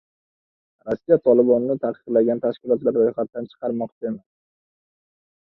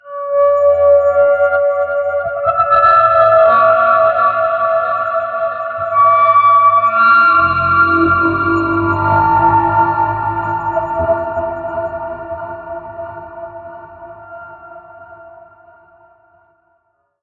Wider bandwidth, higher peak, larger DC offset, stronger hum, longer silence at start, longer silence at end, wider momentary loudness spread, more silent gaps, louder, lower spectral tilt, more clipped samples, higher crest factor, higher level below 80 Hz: about the same, 4.3 kHz vs 4.7 kHz; second, -4 dBFS vs 0 dBFS; neither; neither; first, 0.85 s vs 0.05 s; second, 1.25 s vs 1.95 s; second, 14 LU vs 19 LU; first, 3.92-4.01 s vs none; second, -21 LUFS vs -12 LUFS; first, -10.5 dB/octave vs -8.5 dB/octave; neither; first, 20 dB vs 12 dB; second, -66 dBFS vs -46 dBFS